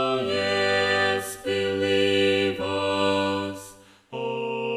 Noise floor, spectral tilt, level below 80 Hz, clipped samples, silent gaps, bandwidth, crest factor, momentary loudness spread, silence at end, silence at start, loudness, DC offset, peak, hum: -48 dBFS; -4 dB/octave; -62 dBFS; under 0.1%; none; 14.5 kHz; 14 dB; 10 LU; 0 s; 0 s; -24 LUFS; under 0.1%; -10 dBFS; none